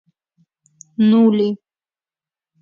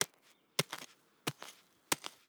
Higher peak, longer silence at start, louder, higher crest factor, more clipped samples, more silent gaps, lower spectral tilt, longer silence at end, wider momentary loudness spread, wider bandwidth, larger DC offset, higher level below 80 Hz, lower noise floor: first, -4 dBFS vs -8 dBFS; first, 1 s vs 0 s; first, -15 LUFS vs -39 LUFS; second, 14 dB vs 34 dB; neither; neither; first, -8 dB/octave vs -2 dB/octave; first, 1.05 s vs 0.2 s; first, 19 LU vs 15 LU; second, 7.2 kHz vs over 20 kHz; neither; first, -68 dBFS vs -86 dBFS; first, under -90 dBFS vs -69 dBFS